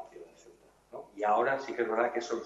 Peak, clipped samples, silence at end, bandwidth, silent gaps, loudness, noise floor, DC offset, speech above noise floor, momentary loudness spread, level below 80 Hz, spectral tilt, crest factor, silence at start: -12 dBFS; under 0.1%; 0 s; 11.5 kHz; none; -30 LUFS; -60 dBFS; under 0.1%; 30 dB; 21 LU; -74 dBFS; -4.5 dB/octave; 20 dB; 0 s